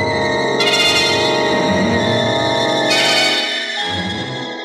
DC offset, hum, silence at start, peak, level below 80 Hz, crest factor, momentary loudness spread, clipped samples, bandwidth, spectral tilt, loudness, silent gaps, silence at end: under 0.1%; none; 0 s; -4 dBFS; -52 dBFS; 12 dB; 8 LU; under 0.1%; 16 kHz; -3.5 dB/octave; -15 LUFS; none; 0 s